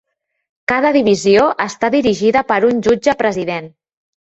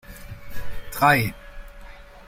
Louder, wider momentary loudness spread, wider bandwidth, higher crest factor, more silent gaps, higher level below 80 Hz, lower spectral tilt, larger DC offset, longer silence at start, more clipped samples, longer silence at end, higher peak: first, -14 LUFS vs -20 LUFS; second, 9 LU vs 27 LU; second, 8.2 kHz vs 16.5 kHz; second, 14 dB vs 20 dB; neither; second, -50 dBFS vs -40 dBFS; about the same, -5 dB/octave vs -5 dB/octave; neither; first, 0.7 s vs 0.1 s; neither; first, 0.65 s vs 0.05 s; about the same, -2 dBFS vs -4 dBFS